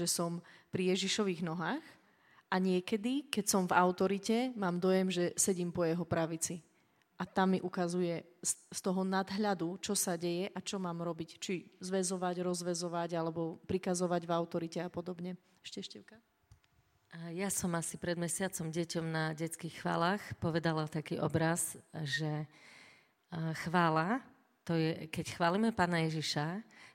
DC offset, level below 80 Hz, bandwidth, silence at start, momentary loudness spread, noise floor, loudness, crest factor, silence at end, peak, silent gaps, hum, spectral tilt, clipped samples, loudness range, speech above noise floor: under 0.1%; -70 dBFS; 16.5 kHz; 0 s; 11 LU; -72 dBFS; -35 LUFS; 22 dB; 0.05 s; -12 dBFS; none; none; -4.5 dB/octave; under 0.1%; 6 LU; 37 dB